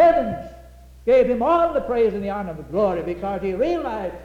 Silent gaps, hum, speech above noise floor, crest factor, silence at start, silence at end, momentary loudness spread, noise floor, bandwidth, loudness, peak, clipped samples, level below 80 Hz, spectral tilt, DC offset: none; none; 23 dB; 14 dB; 0 s; 0 s; 11 LU; -44 dBFS; 8.8 kHz; -21 LUFS; -8 dBFS; under 0.1%; -44 dBFS; -7.5 dB/octave; under 0.1%